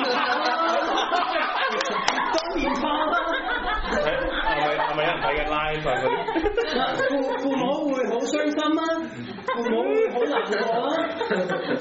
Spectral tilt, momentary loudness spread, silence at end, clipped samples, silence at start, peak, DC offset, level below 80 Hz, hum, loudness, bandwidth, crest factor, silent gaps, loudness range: -2 dB/octave; 3 LU; 0 s; under 0.1%; 0 s; -4 dBFS; under 0.1%; -42 dBFS; none; -24 LUFS; 8 kHz; 20 dB; none; 1 LU